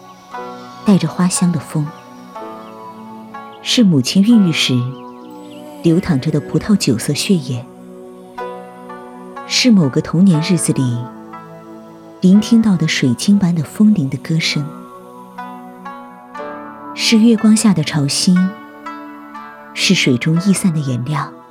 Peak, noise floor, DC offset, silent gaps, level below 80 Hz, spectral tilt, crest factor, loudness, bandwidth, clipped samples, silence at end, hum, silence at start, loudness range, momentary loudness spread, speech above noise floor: -2 dBFS; -36 dBFS; under 0.1%; none; -52 dBFS; -5 dB/octave; 14 dB; -14 LUFS; 15.5 kHz; under 0.1%; 0.1 s; none; 0.05 s; 5 LU; 22 LU; 23 dB